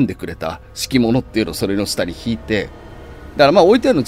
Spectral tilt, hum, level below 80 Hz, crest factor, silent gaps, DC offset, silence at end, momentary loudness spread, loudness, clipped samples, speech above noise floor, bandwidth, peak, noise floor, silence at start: -5 dB/octave; none; -38 dBFS; 16 dB; none; under 0.1%; 0 s; 19 LU; -17 LUFS; under 0.1%; 19 dB; 16 kHz; 0 dBFS; -35 dBFS; 0 s